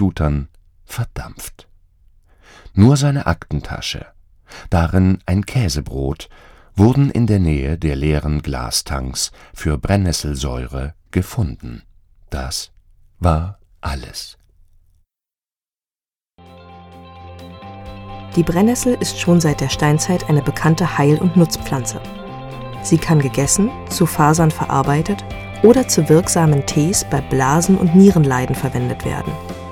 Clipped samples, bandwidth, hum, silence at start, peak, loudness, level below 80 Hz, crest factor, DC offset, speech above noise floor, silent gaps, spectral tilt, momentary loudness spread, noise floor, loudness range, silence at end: under 0.1%; 17 kHz; none; 0 s; 0 dBFS; -17 LUFS; -32 dBFS; 18 dB; under 0.1%; over 74 dB; none; -5.5 dB/octave; 17 LU; under -90 dBFS; 11 LU; 0 s